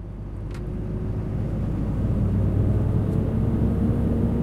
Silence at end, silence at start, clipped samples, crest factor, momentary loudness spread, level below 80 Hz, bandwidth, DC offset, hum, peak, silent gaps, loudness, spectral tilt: 0 s; 0 s; under 0.1%; 12 dB; 9 LU; -30 dBFS; 4.7 kHz; under 0.1%; none; -10 dBFS; none; -25 LUFS; -10.5 dB/octave